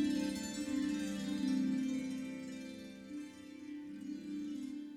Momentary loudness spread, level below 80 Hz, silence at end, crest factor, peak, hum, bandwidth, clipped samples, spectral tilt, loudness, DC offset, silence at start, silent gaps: 13 LU; -70 dBFS; 0 s; 14 dB; -24 dBFS; none; 15.5 kHz; under 0.1%; -5 dB/octave; -40 LUFS; under 0.1%; 0 s; none